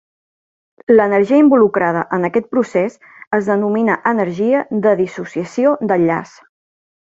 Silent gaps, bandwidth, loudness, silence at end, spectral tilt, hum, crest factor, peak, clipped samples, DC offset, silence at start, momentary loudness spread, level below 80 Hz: 3.27-3.31 s; 7.8 kHz; -15 LUFS; 0.8 s; -8 dB/octave; none; 14 dB; 0 dBFS; under 0.1%; under 0.1%; 0.9 s; 10 LU; -60 dBFS